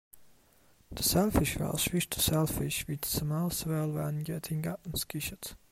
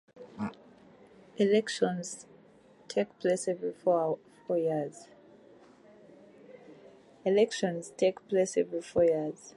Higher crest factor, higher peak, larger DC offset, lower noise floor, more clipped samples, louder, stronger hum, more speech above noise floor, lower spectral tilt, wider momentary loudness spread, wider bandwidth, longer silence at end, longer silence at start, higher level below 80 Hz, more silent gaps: about the same, 18 dB vs 18 dB; about the same, -14 dBFS vs -14 dBFS; neither; first, -64 dBFS vs -59 dBFS; neither; about the same, -31 LUFS vs -30 LUFS; neither; first, 33 dB vs 29 dB; about the same, -4.5 dB/octave vs -5 dB/octave; second, 9 LU vs 13 LU; first, 16 kHz vs 11.5 kHz; about the same, 0.15 s vs 0.05 s; about the same, 0.15 s vs 0.15 s; first, -48 dBFS vs -72 dBFS; neither